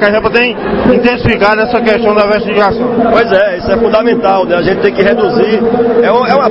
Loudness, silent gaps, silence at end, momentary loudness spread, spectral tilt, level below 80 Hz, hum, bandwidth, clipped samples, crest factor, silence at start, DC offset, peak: -9 LUFS; none; 0 s; 2 LU; -7.5 dB/octave; -34 dBFS; none; 7.2 kHz; 0.4%; 8 dB; 0 s; 0.5%; 0 dBFS